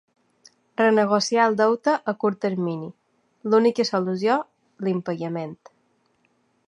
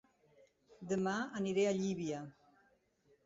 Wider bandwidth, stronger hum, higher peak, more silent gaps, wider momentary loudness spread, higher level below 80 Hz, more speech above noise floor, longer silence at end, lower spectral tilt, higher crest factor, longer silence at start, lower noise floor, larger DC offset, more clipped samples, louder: first, 10.5 kHz vs 7.8 kHz; neither; first, -6 dBFS vs -24 dBFS; neither; about the same, 15 LU vs 15 LU; about the same, -76 dBFS vs -76 dBFS; first, 45 dB vs 37 dB; first, 1.15 s vs 0.95 s; about the same, -5.5 dB/octave vs -5.5 dB/octave; about the same, 18 dB vs 16 dB; about the same, 0.8 s vs 0.8 s; second, -67 dBFS vs -73 dBFS; neither; neither; first, -22 LUFS vs -37 LUFS